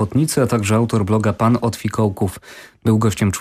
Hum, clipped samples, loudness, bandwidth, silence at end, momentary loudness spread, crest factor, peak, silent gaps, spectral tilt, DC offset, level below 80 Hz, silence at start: none; under 0.1%; -18 LUFS; 15.5 kHz; 0 s; 7 LU; 14 dB; -4 dBFS; none; -6.5 dB/octave; under 0.1%; -48 dBFS; 0 s